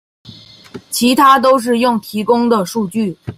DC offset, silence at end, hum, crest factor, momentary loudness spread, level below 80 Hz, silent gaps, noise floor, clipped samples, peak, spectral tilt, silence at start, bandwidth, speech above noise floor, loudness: under 0.1%; 0.05 s; none; 14 dB; 10 LU; -56 dBFS; none; -38 dBFS; under 0.1%; 0 dBFS; -4.5 dB/octave; 0.25 s; 16 kHz; 25 dB; -13 LUFS